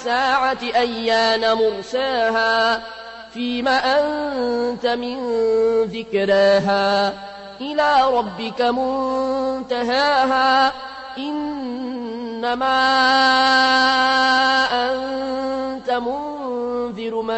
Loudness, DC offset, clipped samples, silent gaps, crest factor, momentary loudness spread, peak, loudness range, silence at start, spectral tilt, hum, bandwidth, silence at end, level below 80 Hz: -19 LUFS; under 0.1%; under 0.1%; none; 14 dB; 12 LU; -6 dBFS; 4 LU; 0 s; -3.5 dB/octave; none; 8.4 kHz; 0 s; -54 dBFS